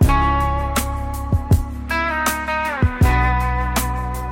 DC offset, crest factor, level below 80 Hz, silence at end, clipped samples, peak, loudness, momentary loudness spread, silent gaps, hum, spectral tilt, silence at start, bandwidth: under 0.1%; 14 dB; -24 dBFS; 0 s; under 0.1%; -4 dBFS; -20 LUFS; 7 LU; none; none; -5.5 dB/octave; 0 s; 17 kHz